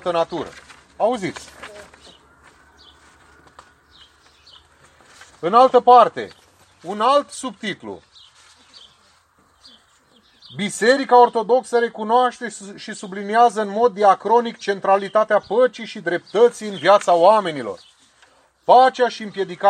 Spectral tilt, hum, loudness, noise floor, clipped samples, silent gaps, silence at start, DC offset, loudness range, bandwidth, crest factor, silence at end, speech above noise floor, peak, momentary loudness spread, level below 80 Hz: -4 dB/octave; none; -17 LUFS; -57 dBFS; under 0.1%; none; 0.05 s; under 0.1%; 12 LU; 10 kHz; 18 dB; 0 s; 40 dB; 0 dBFS; 20 LU; -64 dBFS